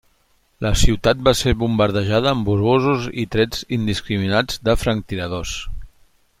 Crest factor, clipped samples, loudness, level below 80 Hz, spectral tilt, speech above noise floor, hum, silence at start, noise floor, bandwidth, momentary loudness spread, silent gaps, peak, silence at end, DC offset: 18 dB; under 0.1%; -19 LUFS; -28 dBFS; -5 dB/octave; 42 dB; none; 0.6 s; -61 dBFS; 16 kHz; 9 LU; none; -2 dBFS; 0.5 s; under 0.1%